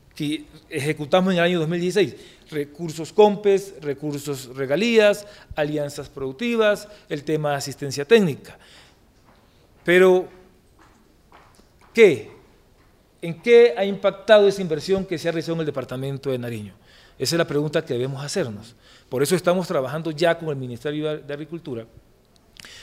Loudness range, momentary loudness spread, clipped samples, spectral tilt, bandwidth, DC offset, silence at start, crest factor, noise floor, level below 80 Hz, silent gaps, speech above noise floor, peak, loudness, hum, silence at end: 6 LU; 16 LU; under 0.1%; -5.5 dB/octave; 16 kHz; under 0.1%; 0.15 s; 20 dB; -56 dBFS; -56 dBFS; none; 35 dB; -2 dBFS; -21 LUFS; none; 0 s